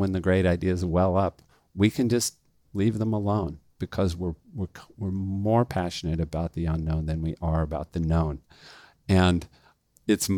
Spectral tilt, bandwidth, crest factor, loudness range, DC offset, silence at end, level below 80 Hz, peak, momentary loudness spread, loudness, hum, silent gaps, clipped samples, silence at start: -6 dB/octave; 18.5 kHz; 18 dB; 3 LU; under 0.1%; 0 s; -44 dBFS; -8 dBFS; 13 LU; -27 LUFS; none; none; under 0.1%; 0 s